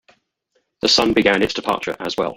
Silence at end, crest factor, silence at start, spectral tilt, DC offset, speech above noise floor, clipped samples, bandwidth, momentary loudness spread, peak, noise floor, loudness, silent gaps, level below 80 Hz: 0 s; 20 dB; 0.85 s; -3 dB/octave; under 0.1%; 50 dB; under 0.1%; 17 kHz; 9 LU; 0 dBFS; -68 dBFS; -17 LUFS; none; -48 dBFS